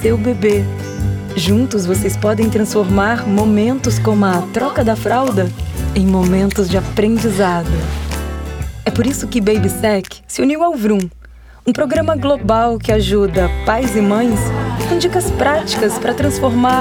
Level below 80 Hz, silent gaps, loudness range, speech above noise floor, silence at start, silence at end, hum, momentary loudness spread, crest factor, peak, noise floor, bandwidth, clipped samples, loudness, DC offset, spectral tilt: -28 dBFS; none; 2 LU; 23 dB; 0 s; 0 s; none; 7 LU; 12 dB; -2 dBFS; -37 dBFS; 18.5 kHz; under 0.1%; -15 LUFS; under 0.1%; -6 dB/octave